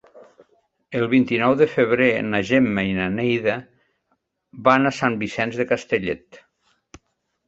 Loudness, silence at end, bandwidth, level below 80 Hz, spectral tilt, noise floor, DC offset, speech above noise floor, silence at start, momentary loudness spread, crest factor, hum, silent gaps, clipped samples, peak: -20 LUFS; 1.1 s; 7.8 kHz; -54 dBFS; -6.5 dB/octave; -71 dBFS; under 0.1%; 51 dB; 0.15 s; 8 LU; 20 dB; none; none; under 0.1%; -2 dBFS